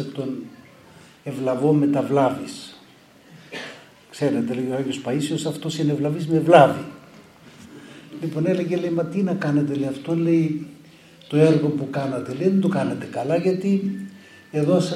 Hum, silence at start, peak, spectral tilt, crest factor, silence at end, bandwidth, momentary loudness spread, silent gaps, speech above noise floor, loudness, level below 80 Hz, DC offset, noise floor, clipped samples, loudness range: none; 0 s; 0 dBFS; -7 dB/octave; 22 dB; 0 s; 13.5 kHz; 19 LU; none; 30 dB; -22 LUFS; -66 dBFS; under 0.1%; -50 dBFS; under 0.1%; 5 LU